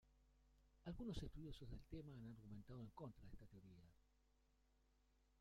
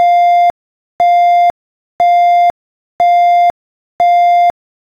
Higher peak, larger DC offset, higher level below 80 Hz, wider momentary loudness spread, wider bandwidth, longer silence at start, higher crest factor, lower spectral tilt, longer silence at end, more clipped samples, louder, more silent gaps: second, -38 dBFS vs -4 dBFS; neither; second, -66 dBFS vs -56 dBFS; first, 13 LU vs 6 LU; first, 16 kHz vs 6.6 kHz; about the same, 0.05 s vs 0 s; first, 20 dB vs 8 dB; first, -7 dB/octave vs -3 dB/octave; second, 0 s vs 0.5 s; neither; second, -58 LUFS vs -10 LUFS; second, none vs 0.50-0.99 s, 1.50-1.99 s, 2.50-2.99 s, 3.50-3.99 s